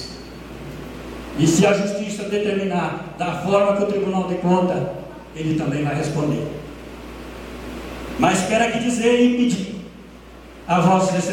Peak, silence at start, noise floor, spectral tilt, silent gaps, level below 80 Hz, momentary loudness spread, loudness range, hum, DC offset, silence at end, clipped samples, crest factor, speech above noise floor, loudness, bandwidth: -4 dBFS; 0 s; -41 dBFS; -5.5 dB/octave; none; -44 dBFS; 19 LU; 4 LU; none; under 0.1%; 0 s; under 0.1%; 18 dB; 22 dB; -20 LUFS; 16.5 kHz